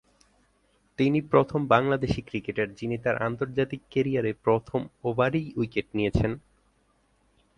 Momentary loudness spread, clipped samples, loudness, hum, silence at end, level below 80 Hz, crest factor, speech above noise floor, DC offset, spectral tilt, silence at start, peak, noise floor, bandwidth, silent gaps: 8 LU; under 0.1%; -27 LUFS; 50 Hz at -60 dBFS; 1.2 s; -48 dBFS; 22 dB; 41 dB; under 0.1%; -8 dB/octave; 1 s; -6 dBFS; -67 dBFS; 10.5 kHz; none